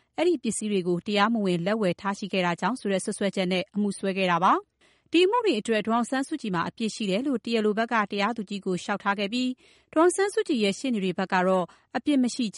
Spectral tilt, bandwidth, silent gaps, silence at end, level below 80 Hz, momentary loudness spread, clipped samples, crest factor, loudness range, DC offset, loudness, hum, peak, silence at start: -5 dB/octave; 11.5 kHz; none; 0 s; -70 dBFS; 7 LU; under 0.1%; 18 dB; 2 LU; under 0.1%; -26 LUFS; none; -8 dBFS; 0.2 s